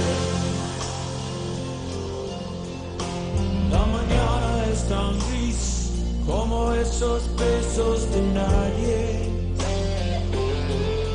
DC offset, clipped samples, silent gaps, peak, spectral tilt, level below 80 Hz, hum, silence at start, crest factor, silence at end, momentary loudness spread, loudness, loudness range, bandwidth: under 0.1%; under 0.1%; none; -8 dBFS; -5.5 dB/octave; -28 dBFS; none; 0 s; 16 dB; 0 s; 8 LU; -25 LUFS; 4 LU; 10 kHz